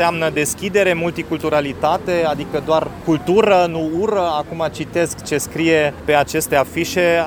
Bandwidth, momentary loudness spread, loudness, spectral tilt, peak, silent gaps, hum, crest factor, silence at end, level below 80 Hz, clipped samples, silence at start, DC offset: over 20 kHz; 6 LU; -18 LUFS; -4.5 dB/octave; 0 dBFS; none; none; 18 dB; 0 s; -44 dBFS; under 0.1%; 0 s; under 0.1%